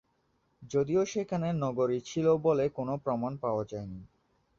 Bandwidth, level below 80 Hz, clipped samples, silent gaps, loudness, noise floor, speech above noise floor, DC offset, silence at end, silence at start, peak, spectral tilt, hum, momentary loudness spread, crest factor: 7.6 kHz; -62 dBFS; under 0.1%; none; -31 LUFS; -73 dBFS; 43 dB; under 0.1%; 0.55 s; 0.6 s; -14 dBFS; -7 dB/octave; none; 10 LU; 16 dB